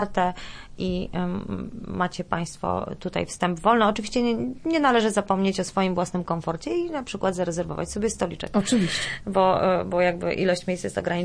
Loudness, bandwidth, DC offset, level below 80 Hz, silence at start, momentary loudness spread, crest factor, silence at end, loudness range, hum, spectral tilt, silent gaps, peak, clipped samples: -25 LUFS; 10.5 kHz; under 0.1%; -46 dBFS; 0 s; 9 LU; 18 dB; 0 s; 4 LU; none; -5 dB/octave; none; -6 dBFS; under 0.1%